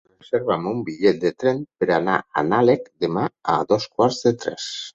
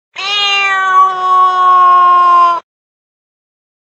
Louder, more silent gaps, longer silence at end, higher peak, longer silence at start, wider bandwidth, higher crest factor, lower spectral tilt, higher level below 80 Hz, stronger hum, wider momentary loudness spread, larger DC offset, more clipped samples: second, -21 LUFS vs -8 LUFS; neither; second, 0.05 s vs 1.4 s; about the same, -2 dBFS vs 0 dBFS; first, 0.35 s vs 0.15 s; about the same, 8 kHz vs 8.2 kHz; first, 18 dB vs 10 dB; first, -5.5 dB/octave vs 0 dB/octave; first, -60 dBFS vs -70 dBFS; neither; about the same, 7 LU vs 6 LU; neither; neither